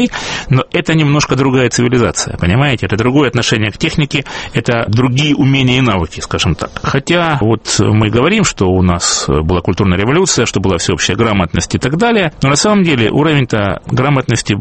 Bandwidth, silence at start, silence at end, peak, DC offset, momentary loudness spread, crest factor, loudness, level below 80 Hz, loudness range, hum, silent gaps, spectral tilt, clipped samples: 8.8 kHz; 0 s; 0 s; 0 dBFS; under 0.1%; 5 LU; 12 dB; -12 LUFS; -32 dBFS; 1 LU; none; none; -5 dB/octave; under 0.1%